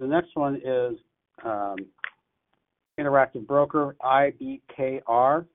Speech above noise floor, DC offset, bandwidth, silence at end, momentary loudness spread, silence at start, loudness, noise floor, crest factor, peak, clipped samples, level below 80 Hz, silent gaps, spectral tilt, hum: 51 dB; under 0.1%; 3.9 kHz; 0.1 s; 16 LU; 0 s; -25 LUFS; -76 dBFS; 18 dB; -8 dBFS; under 0.1%; -66 dBFS; none; -10.5 dB/octave; none